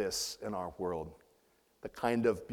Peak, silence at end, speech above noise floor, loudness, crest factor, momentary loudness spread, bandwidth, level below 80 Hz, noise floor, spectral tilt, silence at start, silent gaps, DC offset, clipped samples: -16 dBFS; 0 s; 35 dB; -36 LUFS; 20 dB; 17 LU; 18.5 kHz; -62 dBFS; -71 dBFS; -4 dB/octave; 0 s; none; under 0.1%; under 0.1%